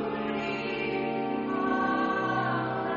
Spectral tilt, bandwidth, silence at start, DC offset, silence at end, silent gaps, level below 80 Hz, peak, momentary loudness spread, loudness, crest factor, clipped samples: -4 dB/octave; 7.2 kHz; 0 s; under 0.1%; 0 s; none; -62 dBFS; -16 dBFS; 4 LU; -29 LUFS; 14 dB; under 0.1%